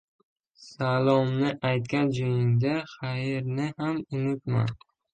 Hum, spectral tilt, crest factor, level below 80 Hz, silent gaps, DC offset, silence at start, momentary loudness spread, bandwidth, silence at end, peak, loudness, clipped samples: none; -8 dB/octave; 18 dB; -62 dBFS; none; under 0.1%; 0.6 s; 8 LU; 8.8 kHz; 0.4 s; -10 dBFS; -27 LUFS; under 0.1%